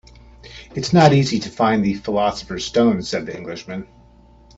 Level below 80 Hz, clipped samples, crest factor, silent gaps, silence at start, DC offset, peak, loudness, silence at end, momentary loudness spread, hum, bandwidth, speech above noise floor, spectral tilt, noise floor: -48 dBFS; under 0.1%; 20 dB; none; 0.45 s; under 0.1%; 0 dBFS; -18 LUFS; 0.7 s; 18 LU; none; 8 kHz; 30 dB; -6 dB/octave; -48 dBFS